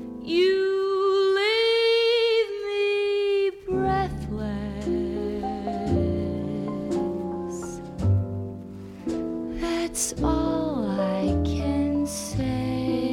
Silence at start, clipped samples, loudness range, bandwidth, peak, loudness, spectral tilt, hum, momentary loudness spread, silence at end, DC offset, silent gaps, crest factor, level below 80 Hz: 0 s; under 0.1%; 7 LU; 16 kHz; -12 dBFS; -25 LUFS; -5 dB/octave; none; 10 LU; 0 s; under 0.1%; none; 14 dB; -40 dBFS